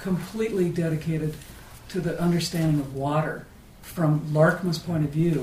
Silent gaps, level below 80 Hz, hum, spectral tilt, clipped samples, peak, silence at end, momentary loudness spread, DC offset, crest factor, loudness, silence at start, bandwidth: none; -48 dBFS; none; -6.5 dB/octave; under 0.1%; -6 dBFS; 0 s; 17 LU; under 0.1%; 20 dB; -25 LUFS; 0 s; 15.5 kHz